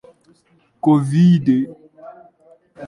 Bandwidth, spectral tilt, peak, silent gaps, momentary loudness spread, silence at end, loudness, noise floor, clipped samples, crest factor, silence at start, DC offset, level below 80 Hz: 11 kHz; -9 dB/octave; -4 dBFS; none; 8 LU; 0 s; -16 LUFS; -58 dBFS; under 0.1%; 16 dB; 0.85 s; under 0.1%; -60 dBFS